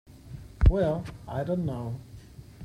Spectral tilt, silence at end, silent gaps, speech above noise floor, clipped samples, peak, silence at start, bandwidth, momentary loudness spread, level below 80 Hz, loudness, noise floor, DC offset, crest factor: -9 dB/octave; 0 s; none; 17 dB; under 0.1%; -8 dBFS; 0.15 s; 10.5 kHz; 24 LU; -30 dBFS; -28 LUFS; -47 dBFS; under 0.1%; 20 dB